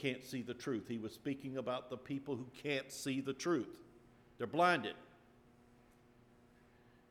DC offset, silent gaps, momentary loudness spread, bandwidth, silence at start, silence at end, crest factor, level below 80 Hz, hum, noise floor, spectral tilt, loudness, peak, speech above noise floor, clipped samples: under 0.1%; none; 13 LU; 17 kHz; 0 s; 1.95 s; 22 dB; -76 dBFS; none; -66 dBFS; -5 dB/octave; -40 LUFS; -18 dBFS; 27 dB; under 0.1%